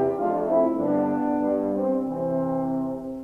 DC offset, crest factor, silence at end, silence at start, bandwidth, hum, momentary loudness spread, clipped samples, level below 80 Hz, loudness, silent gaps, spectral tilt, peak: under 0.1%; 14 dB; 0 s; 0 s; 3.6 kHz; none; 5 LU; under 0.1%; -56 dBFS; -25 LUFS; none; -10 dB/octave; -10 dBFS